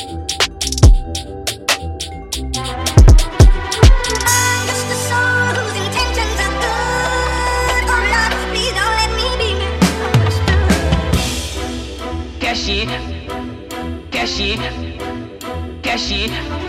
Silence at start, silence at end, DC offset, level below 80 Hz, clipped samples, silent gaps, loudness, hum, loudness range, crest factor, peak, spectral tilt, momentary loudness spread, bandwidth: 0 s; 0 s; under 0.1%; -18 dBFS; under 0.1%; none; -16 LUFS; none; 8 LU; 16 dB; 0 dBFS; -4 dB/octave; 13 LU; 16 kHz